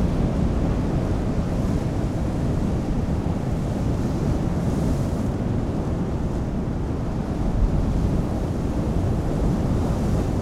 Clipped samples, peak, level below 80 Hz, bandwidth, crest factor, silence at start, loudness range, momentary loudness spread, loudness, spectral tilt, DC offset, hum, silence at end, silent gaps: under 0.1%; -10 dBFS; -28 dBFS; 13.5 kHz; 12 dB; 0 s; 1 LU; 3 LU; -24 LUFS; -8 dB/octave; under 0.1%; none; 0 s; none